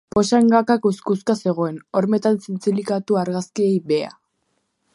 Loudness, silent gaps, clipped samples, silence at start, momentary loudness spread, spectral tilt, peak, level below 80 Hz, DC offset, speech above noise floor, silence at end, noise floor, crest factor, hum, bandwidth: -20 LUFS; none; under 0.1%; 0.15 s; 8 LU; -6.5 dB/octave; -2 dBFS; -60 dBFS; under 0.1%; 51 dB; 0.85 s; -70 dBFS; 18 dB; none; 11.5 kHz